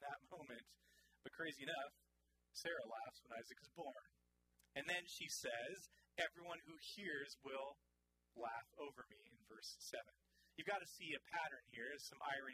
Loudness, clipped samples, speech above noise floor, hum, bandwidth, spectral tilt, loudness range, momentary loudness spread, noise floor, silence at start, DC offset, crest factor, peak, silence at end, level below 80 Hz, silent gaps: -50 LUFS; under 0.1%; 34 dB; none; 15.5 kHz; -2 dB/octave; 4 LU; 13 LU; -85 dBFS; 0 s; under 0.1%; 24 dB; -28 dBFS; 0 s; -84 dBFS; none